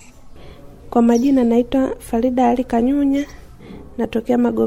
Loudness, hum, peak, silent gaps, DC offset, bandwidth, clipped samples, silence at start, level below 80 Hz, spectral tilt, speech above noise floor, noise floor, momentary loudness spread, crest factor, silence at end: -17 LUFS; none; -2 dBFS; none; under 0.1%; 13.5 kHz; under 0.1%; 0.25 s; -40 dBFS; -6.5 dB/octave; 22 dB; -38 dBFS; 8 LU; 16 dB; 0 s